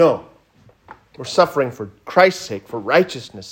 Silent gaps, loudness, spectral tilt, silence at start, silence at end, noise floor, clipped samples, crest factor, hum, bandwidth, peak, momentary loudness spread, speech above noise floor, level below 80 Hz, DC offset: none; -18 LUFS; -5 dB/octave; 0 s; 0 s; -53 dBFS; under 0.1%; 18 dB; none; 16.5 kHz; 0 dBFS; 15 LU; 35 dB; -62 dBFS; under 0.1%